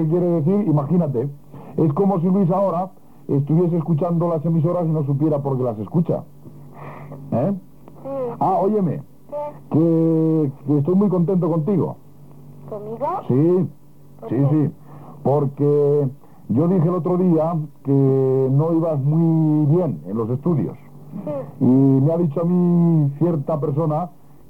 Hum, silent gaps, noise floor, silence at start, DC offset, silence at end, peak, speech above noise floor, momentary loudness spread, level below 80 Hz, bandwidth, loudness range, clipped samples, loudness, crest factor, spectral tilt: none; none; -43 dBFS; 0 s; 0.6%; 0.4 s; -6 dBFS; 25 dB; 13 LU; -60 dBFS; 3.3 kHz; 4 LU; under 0.1%; -19 LUFS; 14 dB; -12 dB/octave